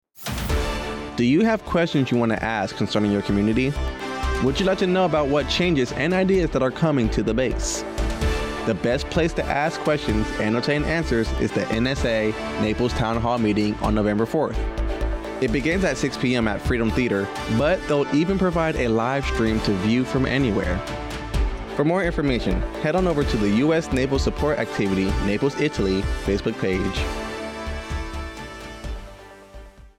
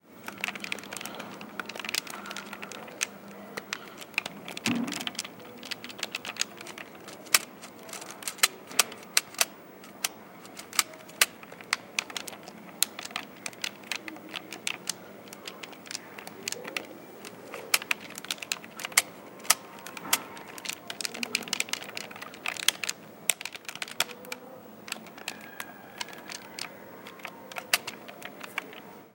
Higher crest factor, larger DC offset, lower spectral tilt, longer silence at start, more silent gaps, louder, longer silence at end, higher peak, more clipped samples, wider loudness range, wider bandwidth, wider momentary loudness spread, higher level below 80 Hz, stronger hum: second, 12 dB vs 34 dB; neither; first, -6 dB/octave vs 0 dB/octave; first, 0.2 s vs 0.05 s; neither; first, -23 LUFS vs -32 LUFS; about the same, 0.1 s vs 0 s; second, -10 dBFS vs 0 dBFS; neither; second, 2 LU vs 8 LU; about the same, 17.5 kHz vs 17 kHz; second, 8 LU vs 17 LU; first, -32 dBFS vs -78 dBFS; neither